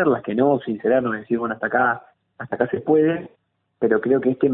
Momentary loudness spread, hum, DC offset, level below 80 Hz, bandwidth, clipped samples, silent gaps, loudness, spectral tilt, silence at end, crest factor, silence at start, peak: 8 LU; none; under 0.1%; -62 dBFS; 3.9 kHz; under 0.1%; none; -21 LUFS; -12 dB/octave; 0 s; 16 dB; 0 s; -6 dBFS